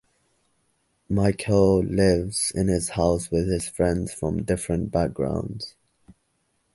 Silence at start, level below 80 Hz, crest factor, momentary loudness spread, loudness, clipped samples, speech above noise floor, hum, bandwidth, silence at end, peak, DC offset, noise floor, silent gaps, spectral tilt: 1.1 s; -40 dBFS; 20 dB; 8 LU; -24 LUFS; under 0.1%; 48 dB; none; 11.5 kHz; 1.05 s; -6 dBFS; under 0.1%; -71 dBFS; none; -6 dB/octave